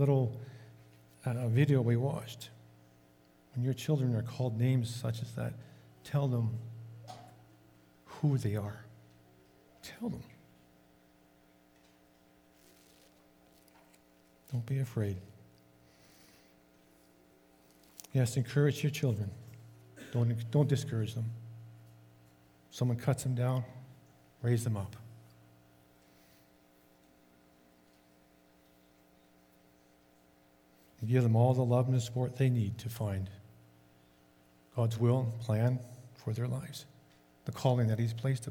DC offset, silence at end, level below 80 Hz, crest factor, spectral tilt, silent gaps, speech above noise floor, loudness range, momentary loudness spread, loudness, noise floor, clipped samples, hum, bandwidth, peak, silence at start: under 0.1%; 0 s; -72 dBFS; 22 dB; -7.5 dB/octave; none; 33 dB; 11 LU; 22 LU; -33 LUFS; -65 dBFS; under 0.1%; none; 17 kHz; -14 dBFS; 0 s